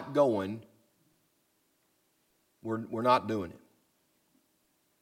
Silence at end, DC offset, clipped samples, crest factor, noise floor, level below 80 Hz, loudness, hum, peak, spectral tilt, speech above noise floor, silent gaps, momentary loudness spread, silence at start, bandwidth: 1.45 s; under 0.1%; under 0.1%; 24 dB; -74 dBFS; -74 dBFS; -30 LUFS; none; -10 dBFS; -6.5 dB/octave; 44 dB; none; 17 LU; 0 s; 16 kHz